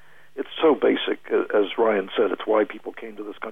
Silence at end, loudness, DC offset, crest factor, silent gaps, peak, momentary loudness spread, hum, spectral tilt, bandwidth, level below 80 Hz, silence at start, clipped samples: 0 s; -22 LUFS; 0.6%; 14 dB; none; -8 dBFS; 16 LU; none; -6.5 dB/octave; 3.9 kHz; -66 dBFS; 0.35 s; under 0.1%